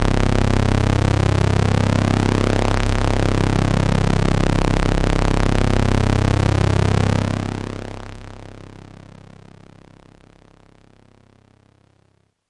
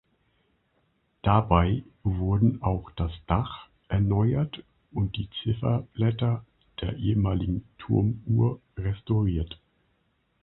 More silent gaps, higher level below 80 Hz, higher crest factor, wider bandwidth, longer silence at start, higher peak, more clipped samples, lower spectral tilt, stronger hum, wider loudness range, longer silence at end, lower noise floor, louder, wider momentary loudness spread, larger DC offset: neither; first, -26 dBFS vs -40 dBFS; second, 16 dB vs 22 dB; first, 11.5 kHz vs 4.1 kHz; second, 0 s vs 1.25 s; about the same, -4 dBFS vs -4 dBFS; neither; second, -6.5 dB/octave vs -12 dB/octave; neither; first, 9 LU vs 2 LU; first, 3.9 s vs 0.9 s; second, -61 dBFS vs -71 dBFS; first, -18 LUFS vs -27 LUFS; about the same, 13 LU vs 11 LU; neither